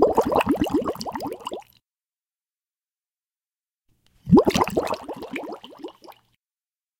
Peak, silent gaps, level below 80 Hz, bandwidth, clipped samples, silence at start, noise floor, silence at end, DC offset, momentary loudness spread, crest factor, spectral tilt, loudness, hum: -4 dBFS; none; -50 dBFS; 17 kHz; under 0.1%; 0 s; under -90 dBFS; 0.9 s; under 0.1%; 22 LU; 22 dB; -6 dB/octave; -23 LUFS; none